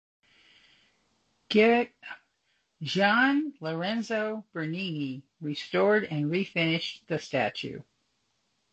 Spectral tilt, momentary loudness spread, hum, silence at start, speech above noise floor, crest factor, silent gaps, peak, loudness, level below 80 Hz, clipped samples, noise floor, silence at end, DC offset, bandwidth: -6 dB/octave; 16 LU; none; 1.5 s; 47 dB; 20 dB; none; -8 dBFS; -28 LUFS; -72 dBFS; under 0.1%; -75 dBFS; 0.9 s; under 0.1%; 8.4 kHz